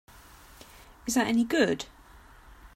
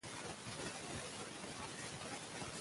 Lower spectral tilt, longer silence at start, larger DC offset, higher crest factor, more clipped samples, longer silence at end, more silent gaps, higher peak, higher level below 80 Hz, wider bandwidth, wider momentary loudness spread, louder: about the same, -3.5 dB/octave vs -3 dB/octave; first, 1.05 s vs 0.05 s; neither; about the same, 20 dB vs 16 dB; neither; about the same, 0.1 s vs 0 s; neither; first, -12 dBFS vs -32 dBFS; first, -56 dBFS vs -68 dBFS; first, 16 kHz vs 11.5 kHz; first, 23 LU vs 2 LU; first, -27 LUFS vs -46 LUFS